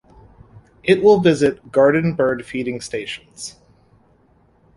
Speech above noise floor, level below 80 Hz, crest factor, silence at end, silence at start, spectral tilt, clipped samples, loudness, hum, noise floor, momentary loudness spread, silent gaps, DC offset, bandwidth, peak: 39 dB; -52 dBFS; 18 dB; 1.25 s; 0.85 s; -6 dB/octave; under 0.1%; -17 LUFS; none; -56 dBFS; 17 LU; none; under 0.1%; 11.5 kHz; -2 dBFS